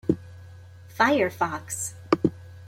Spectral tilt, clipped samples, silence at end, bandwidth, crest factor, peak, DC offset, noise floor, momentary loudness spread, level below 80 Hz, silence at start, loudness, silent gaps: -4.5 dB/octave; under 0.1%; 0 s; 16.5 kHz; 24 dB; -2 dBFS; under 0.1%; -46 dBFS; 23 LU; -58 dBFS; 0.05 s; -25 LUFS; none